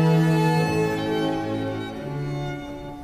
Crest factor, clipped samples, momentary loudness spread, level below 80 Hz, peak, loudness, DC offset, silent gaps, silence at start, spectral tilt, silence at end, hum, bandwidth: 14 dB; under 0.1%; 12 LU; -48 dBFS; -10 dBFS; -24 LUFS; under 0.1%; none; 0 s; -7 dB/octave; 0 s; none; 14 kHz